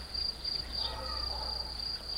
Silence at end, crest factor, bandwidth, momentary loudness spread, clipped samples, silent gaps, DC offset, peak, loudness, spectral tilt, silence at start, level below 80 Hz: 0 s; 16 dB; 16 kHz; 2 LU; under 0.1%; none; under 0.1%; -22 dBFS; -34 LUFS; -3 dB/octave; 0 s; -46 dBFS